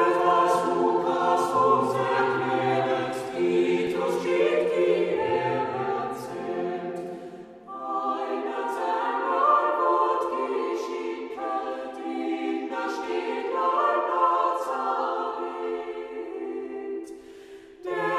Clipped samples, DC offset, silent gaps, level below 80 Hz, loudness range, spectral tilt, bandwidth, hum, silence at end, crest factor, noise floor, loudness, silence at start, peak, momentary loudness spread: under 0.1%; under 0.1%; none; -68 dBFS; 6 LU; -5.5 dB/octave; 14 kHz; none; 0 s; 18 dB; -46 dBFS; -26 LUFS; 0 s; -8 dBFS; 13 LU